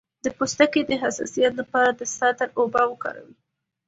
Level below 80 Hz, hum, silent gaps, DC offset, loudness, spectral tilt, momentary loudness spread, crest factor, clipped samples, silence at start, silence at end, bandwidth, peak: -62 dBFS; none; none; under 0.1%; -23 LUFS; -3 dB/octave; 11 LU; 20 dB; under 0.1%; 0.25 s; 0.65 s; 8 kHz; -4 dBFS